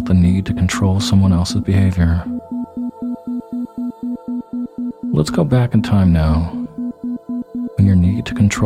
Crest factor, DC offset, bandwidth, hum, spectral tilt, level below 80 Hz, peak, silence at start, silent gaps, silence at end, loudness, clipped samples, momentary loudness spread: 16 dB; under 0.1%; 12 kHz; none; -7 dB/octave; -30 dBFS; 0 dBFS; 0 s; none; 0 s; -18 LUFS; under 0.1%; 12 LU